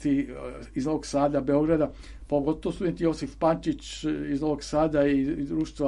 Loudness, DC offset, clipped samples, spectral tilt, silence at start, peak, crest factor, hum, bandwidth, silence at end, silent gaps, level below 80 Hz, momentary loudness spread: -27 LUFS; under 0.1%; under 0.1%; -6.5 dB/octave; 0 s; -10 dBFS; 16 dB; none; 11.5 kHz; 0 s; none; -46 dBFS; 8 LU